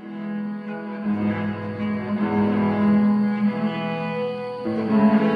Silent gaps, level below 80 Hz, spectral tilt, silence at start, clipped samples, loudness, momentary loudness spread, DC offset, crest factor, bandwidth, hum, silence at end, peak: none; -60 dBFS; -9.5 dB/octave; 0 s; under 0.1%; -23 LUFS; 11 LU; under 0.1%; 14 dB; 5 kHz; none; 0 s; -8 dBFS